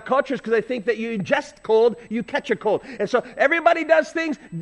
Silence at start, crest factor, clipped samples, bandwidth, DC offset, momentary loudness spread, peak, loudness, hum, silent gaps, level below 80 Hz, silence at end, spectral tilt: 0 s; 18 dB; under 0.1%; 9.8 kHz; under 0.1%; 8 LU; -4 dBFS; -21 LUFS; none; none; -60 dBFS; 0 s; -5.5 dB/octave